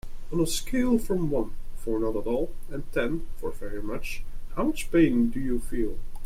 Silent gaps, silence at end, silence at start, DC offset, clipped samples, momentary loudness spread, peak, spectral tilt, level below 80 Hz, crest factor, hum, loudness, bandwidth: none; 0 s; 0.05 s; under 0.1%; under 0.1%; 14 LU; -10 dBFS; -5.5 dB/octave; -34 dBFS; 16 dB; none; -28 LUFS; 15 kHz